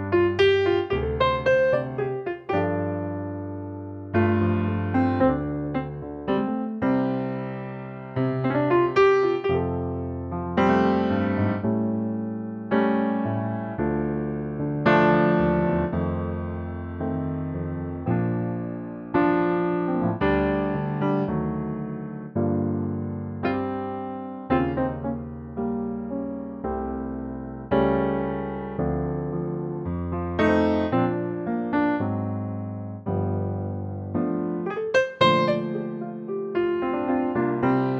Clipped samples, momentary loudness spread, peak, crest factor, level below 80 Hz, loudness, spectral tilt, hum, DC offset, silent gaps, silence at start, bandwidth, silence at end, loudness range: under 0.1%; 11 LU; -6 dBFS; 20 dB; -46 dBFS; -25 LUFS; -8.5 dB/octave; none; under 0.1%; none; 0 s; 7.6 kHz; 0 s; 5 LU